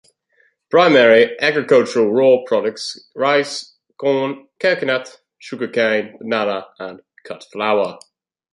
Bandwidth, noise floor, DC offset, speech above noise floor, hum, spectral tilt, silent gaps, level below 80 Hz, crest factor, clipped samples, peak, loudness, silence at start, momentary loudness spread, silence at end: 11.5 kHz; -60 dBFS; under 0.1%; 44 dB; none; -4.5 dB/octave; none; -68 dBFS; 18 dB; under 0.1%; 0 dBFS; -16 LUFS; 0.7 s; 17 LU; 0.55 s